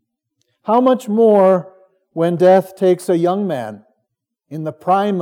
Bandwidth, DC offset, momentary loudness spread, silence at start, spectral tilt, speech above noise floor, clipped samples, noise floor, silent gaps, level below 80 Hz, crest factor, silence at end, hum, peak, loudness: 16.5 kHz; under 0.1%; 16 LU; 0.65 s; -7.5 dB/octave; 60 dB; under 0.1%; -74 dBFS; none; -82 dBFS; 14 dB; 0 s; none; -2 dBFS; -15 LUFS